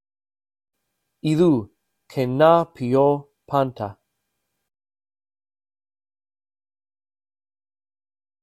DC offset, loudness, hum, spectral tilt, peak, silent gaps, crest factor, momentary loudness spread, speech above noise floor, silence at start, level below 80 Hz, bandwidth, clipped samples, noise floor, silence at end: under 0.1%; -20 LUFS; none; -8 dB/octave; -2 dBFS; none; 24 dB; 14 LU; 58 dB; 1.25 s; -62 dBFS; 14 kHz; under 0.1%; -77 dBFS; 4.5 s